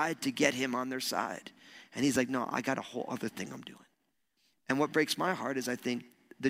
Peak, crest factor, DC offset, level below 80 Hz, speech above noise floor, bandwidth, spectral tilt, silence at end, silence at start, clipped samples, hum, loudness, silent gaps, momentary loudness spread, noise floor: -8 dBFS; 26 dB; under 0.1%; -76 dBFS; 46 dB; 16 kHz; -4 dB/octave; 0 s; 0 s; under 0.1%; none; -33 LUFS; none; 16 LU; -79 dBFS